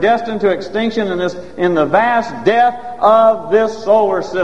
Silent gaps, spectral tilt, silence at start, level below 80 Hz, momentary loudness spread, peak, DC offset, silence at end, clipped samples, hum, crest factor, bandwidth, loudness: none; -6 dB/octave; 0 s; -50 dBFS; 7 LU; 0 dBFS; 2%; 0 s; under 0.1%; none; 14 dB; 8.4 kHz; -14 LUFS